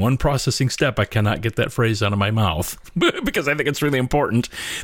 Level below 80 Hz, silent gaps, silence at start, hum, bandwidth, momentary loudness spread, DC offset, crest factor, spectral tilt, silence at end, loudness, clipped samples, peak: -38 dBFS; none; 0 s; none; 17 kHz; 3 LU; under 0.1%; 14 dB; -5 dB/octave; 0 s; -20 LUFS; under 0.1%; -6 dBFS